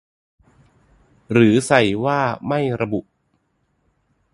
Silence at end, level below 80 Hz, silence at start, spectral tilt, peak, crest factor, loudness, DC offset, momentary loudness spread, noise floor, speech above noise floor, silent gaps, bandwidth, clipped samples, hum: 1.35 s; -54 dBFS; 1.3 s; -6 dB/octave; 0 dBFS; 22 dB; -18 LUFS; under 0.1%; 9 LU; -67 dBFS; 50 dB; none; 11.5 kHz; under 0.1%; none